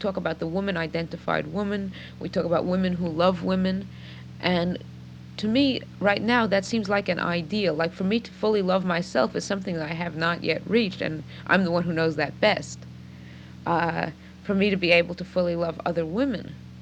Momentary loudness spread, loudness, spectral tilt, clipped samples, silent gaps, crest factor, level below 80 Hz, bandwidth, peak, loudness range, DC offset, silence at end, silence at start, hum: 14 LU; -25 LUFS; -6 dB/octave; under 0.1%; none; 20 dB; -56 dBFS; 9 kHz; -4 dBFS; 2 LU; under 0.1%; 0 s; 0 s; none